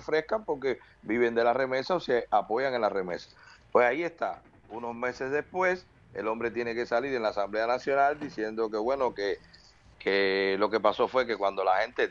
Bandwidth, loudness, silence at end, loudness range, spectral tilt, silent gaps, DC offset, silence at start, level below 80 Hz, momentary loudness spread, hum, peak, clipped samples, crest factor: 7.4 kHz; -29 LUFS; 0 s; 3 LU; -5.5 dB/octave; none; under 0.1%; 0 s; -62 dBFS; 10 LU; none; -8 dBFS; under 0.1%; 20 dB